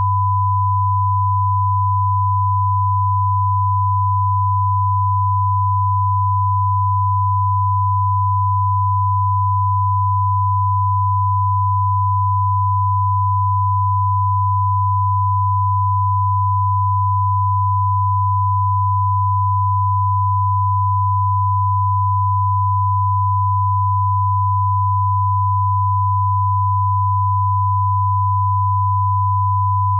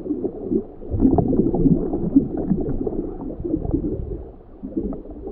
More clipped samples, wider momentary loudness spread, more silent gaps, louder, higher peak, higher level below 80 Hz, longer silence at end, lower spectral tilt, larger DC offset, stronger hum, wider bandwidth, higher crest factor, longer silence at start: neither; second, 0 LU vs 13 LU; neither; first, -17 LUFS vs -23 LUFS; second, -10 dBFS vs -4 dBFS; second, -52 dBFS vs -32 dBFS; about the same, 0 s vs 0 s; about the same, -15 dB/octave vs -14.5 dB/octave; neither; neither; second, 1.1 kHz vs 1.9 kHz; second, 6 dB vs 18 dB; about the same, 0 s vs 0 s